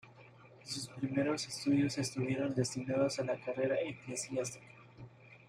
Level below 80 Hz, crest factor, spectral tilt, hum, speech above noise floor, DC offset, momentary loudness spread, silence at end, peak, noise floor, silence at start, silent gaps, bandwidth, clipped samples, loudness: -72 dBFS; 18 dB; -5 dB/octave; none; 23 dB; under 0.1%; 20 LU; 0.1 s; -20 dBFS; -58 dBFS; 0.05 s; none; 15 kHz; under 0.1%; -36 LUFS